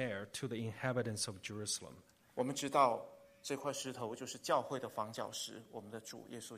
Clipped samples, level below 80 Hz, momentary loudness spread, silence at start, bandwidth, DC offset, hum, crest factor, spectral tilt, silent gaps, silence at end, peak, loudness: under 0.1%; -78 dBFS; 15 LU; 0 s; 15 kHz; under 0.1%; none; 24 dB; -4 dB/octave; none; 0 s; -16 dBFS; -40 LUFS